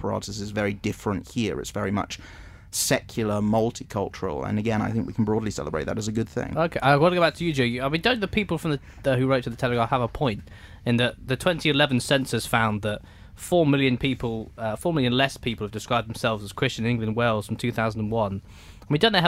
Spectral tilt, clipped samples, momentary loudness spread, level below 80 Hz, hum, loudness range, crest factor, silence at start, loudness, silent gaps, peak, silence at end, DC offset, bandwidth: -5 dB/octave; under 0.1%; 9 LU; -46 dBFS; none; 3 LU; 20 dB; 0 s; -25 LUFS; none; -4 dBFS; 0 s; under 0.1%; 16 kHz